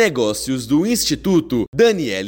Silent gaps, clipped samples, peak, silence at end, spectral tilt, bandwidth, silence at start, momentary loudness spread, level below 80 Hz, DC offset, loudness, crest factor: 1.68-1.73 s; under 0.1%; -4 dBFS; 0 s; -4.5 dB/octave; 17 kHz; 0 s; 5 LU; -44 dBFS; under 0.1%; -17 LUFS; 14 dB